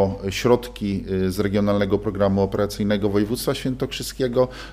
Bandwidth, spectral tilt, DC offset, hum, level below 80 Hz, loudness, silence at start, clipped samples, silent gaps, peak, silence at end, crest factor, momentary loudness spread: 15.5 kHz; -6 dB/octave; under 0.1%; none; -40 dBFS; -22 LUFS; 0 s; under 0.1%; none; -4 dBFS; 0 s; 18 dB; 6 LU